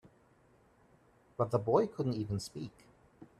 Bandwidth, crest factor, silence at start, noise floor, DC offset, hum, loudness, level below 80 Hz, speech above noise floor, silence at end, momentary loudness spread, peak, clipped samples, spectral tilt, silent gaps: 13 kHz; 22 dB; 1.4 s; -66 dBFS; under 0.1%; none; -34 LUFS; -66 dBFS; 33 dB; 0.15 s; 17 LU; -14 dBFS; under 0.1%; -7.5 dB/octave; none